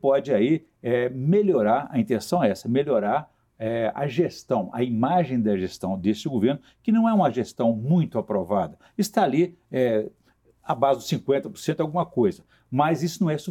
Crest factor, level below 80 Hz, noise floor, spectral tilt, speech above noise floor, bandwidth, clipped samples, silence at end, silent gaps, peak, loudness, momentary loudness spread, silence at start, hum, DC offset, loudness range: 18 dB; -64 dBFS; -57 dBFS; -7 dB/octave; 34 dB; 17 kHz; under 0.1%; 0 s; none; -4 dBFS; -24 LUFS; 6 LU; 0.05 s; none; under 0.1%; 2 LU